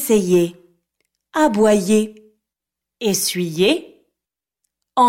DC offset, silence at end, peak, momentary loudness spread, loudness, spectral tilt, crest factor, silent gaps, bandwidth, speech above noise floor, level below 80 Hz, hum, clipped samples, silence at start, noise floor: under 0.1%; 0 s; -4 dBFS; 10 LU; -18 LUFS; -4.5 dB/octave; 16 dB; none; 16.5 kHz; 69 dB; -58 dBFS; none; under 0.1%; 0 s; -86 dBFS